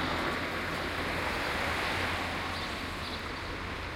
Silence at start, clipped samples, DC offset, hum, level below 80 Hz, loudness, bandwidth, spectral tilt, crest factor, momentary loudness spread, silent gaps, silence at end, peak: 0 s; under 0.1%; under 0.1%; none; -48 dBFS; -33 LUFS; 16 kHz; -4 dB/octave; 16 dB; 6 LU; none; 0 s; -18 dBFS